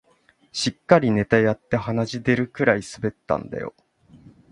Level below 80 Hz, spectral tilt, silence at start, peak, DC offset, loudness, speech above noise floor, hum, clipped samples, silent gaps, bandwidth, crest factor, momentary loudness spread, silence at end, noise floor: -52 dBFS; -6 dB/octave; 0.55 s; 0 dBFS; under 0.1%; -22 LUFS; 39 dB; none; under 0.1%; none; 11.5 kHz; 22 dB; 13 LU; 0.8 s; -60 dBFS